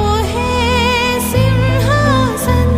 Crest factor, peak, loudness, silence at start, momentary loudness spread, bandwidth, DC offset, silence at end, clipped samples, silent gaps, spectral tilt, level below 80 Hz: 12 dB; 0 dBFS; -13 LUFS; 0 s; 3 LU; 15.5 kHz; under 0.1%; 0 s; under 0.1%; none; -5.5 dB/octave; -24 dBFS